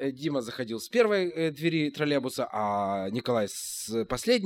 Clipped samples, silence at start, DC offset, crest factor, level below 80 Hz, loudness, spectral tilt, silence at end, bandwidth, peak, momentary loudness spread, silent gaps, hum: under 0.1%; 0 s; under 0.1%; 18 dB; -58 dBFS; -29 LUFS; -4.5 dB/octave; 0 s; 17 kHz; -10 dBFS; 7 LU; none; none